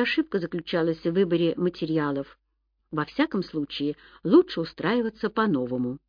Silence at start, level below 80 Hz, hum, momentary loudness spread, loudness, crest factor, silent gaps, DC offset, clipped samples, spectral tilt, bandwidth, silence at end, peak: 0 s; -60 dBFS; none; 11 LU; -26 LUFS; 18 dB; none; under 0.1%; under 0.1%; -8 dB/octave; 5.2 kHz; 0.1 s; -8 dBFS